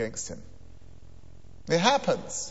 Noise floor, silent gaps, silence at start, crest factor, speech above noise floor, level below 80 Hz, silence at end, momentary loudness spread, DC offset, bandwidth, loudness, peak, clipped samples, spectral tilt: -51 dBFS; none; 0 s; 24 dB; 24 dB; -54 dBFS; 0 s; 21 LU; 0.7%; 8.2 kHz; -27 LUFS; -6 dBFS; under 0.1%; -3.5 dB/octave